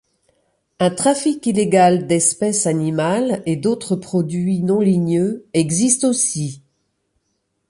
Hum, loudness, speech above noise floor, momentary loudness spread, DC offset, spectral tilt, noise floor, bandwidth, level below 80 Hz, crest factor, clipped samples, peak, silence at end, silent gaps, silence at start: none; -17 LUFS; 53 dB; 6 LU; under 0.1%; -5 dB/octave; -71 dBFS; 11.5 kHz; -58 dBFS; 16 dB; under 0.1%; -2 dBFS; 1.1 s; none; 0.8 s